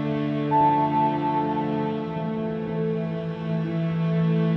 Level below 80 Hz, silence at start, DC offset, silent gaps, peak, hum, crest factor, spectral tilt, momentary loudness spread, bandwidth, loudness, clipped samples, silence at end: -56 dBFS; 0 s; under 0.1%; none; -12 dBFS; none; 12 dB; -10 dB/octave; 8 LU; 5.6 kHz; -25 LUFS; under 0.1%; 0 s